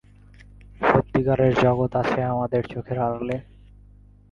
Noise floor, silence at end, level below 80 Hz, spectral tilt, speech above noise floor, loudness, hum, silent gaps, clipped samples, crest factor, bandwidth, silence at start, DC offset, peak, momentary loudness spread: -50 dBFS; 0.9 s; -46 dBFS; -8.5 dB/octave; 28 dB; -23 LUFS; 50 Hz at -40 dBFS; none; under 0.1%; 20 dB; 7.2 kHz; 0.4 s; under 0.1%; -2 dBFS; 10 LU